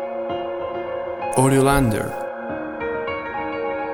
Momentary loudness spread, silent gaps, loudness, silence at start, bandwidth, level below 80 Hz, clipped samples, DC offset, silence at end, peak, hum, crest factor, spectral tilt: 12 LU; none; -22 LUFS; 0 s; 19 kHz; -40 dBFS; under 0.1%; under 0.1%; 0 s; -4 dBFS; none; 20 dB; -6 dB/octave